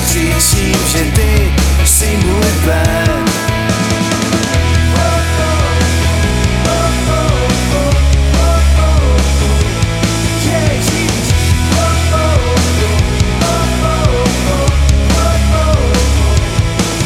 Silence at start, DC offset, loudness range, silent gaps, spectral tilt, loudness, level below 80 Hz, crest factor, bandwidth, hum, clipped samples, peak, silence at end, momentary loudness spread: 0 s; under 0.1%; 1 LU; none; -4.5 dB/octave; -12 LUFS; -14 dBFS; 10 dB; 16.5 kHz; none; under 0.1%; 0 dBFS; 0 s; 3 LU